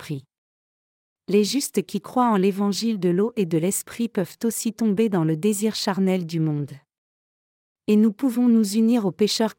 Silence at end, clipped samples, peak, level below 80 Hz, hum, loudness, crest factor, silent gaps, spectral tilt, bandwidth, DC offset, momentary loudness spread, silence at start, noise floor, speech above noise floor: 0.05 s; under 0.1%; -8 dBFS; -72 dBFS; none; -22 LUFS; 14 dB; 0.38-1.16 s, 6.98-7.76 s; -5.5 dB/octave; 17 kHz; under 0.1%; 8 LU; 0 s; under -90 dBFS; over 69 dB